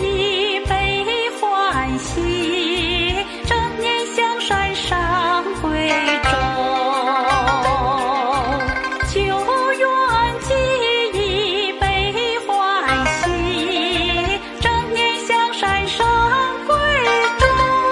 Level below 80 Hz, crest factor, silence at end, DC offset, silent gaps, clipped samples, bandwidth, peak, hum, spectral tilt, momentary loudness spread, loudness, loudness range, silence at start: -32 dBFS; 18 dB; 0 s; under 0.1%; none; under 0.1%; 11.5 kHz; 0 dBFS; none; -4 dB/octave; 4 LU; -18 LUFS; 2 LU; 0 s